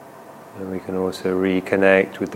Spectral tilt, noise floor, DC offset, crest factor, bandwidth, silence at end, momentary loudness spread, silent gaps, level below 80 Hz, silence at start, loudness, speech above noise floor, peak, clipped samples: -6.5 dB/octave; -41 dBFS; under 0.1%; 20 dB; 16.5 kHz; 0 s; 16 LU; none; -64 dBFS; 0 s; -20 LUFS; 21 dB; 0 dBFS; under 0.1%